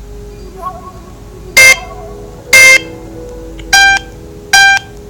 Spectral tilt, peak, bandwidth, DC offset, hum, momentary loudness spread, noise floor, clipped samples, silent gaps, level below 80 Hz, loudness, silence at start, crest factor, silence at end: 0 dB/octave; 0 dBFS; over 20 kHz; under 0.1%; none; 25 LU; -30 dBFS; 2%; none; -32 dBFS; -5 LUFS; 0 s; 10 dB; 0.3 s